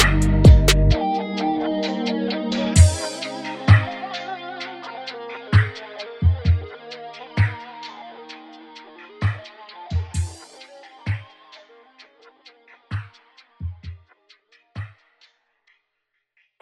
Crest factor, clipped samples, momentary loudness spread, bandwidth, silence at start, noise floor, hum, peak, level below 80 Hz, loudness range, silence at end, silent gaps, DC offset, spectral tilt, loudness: 22 dB; under 0.1%; 24 LU; 16 kHz; 0 s; -76 dBFS; none; 0 dBFS; -28 dBFS; 18 LU; 1.75 s; none; under 0.1%; -5.5 dB/octave; -21 LUFS